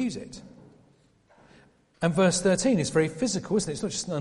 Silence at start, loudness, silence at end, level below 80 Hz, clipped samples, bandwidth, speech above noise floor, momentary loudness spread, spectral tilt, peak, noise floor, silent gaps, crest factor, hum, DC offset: 0 s; -25 LUFS; 0 s; -56 dBFS; under 0.1%; 11.5 kHz; 36 dB; 13 LU; -4.5 dB/octave; -10 dBFS; -61 dBFS; none; 18 dB; none; under 0.1%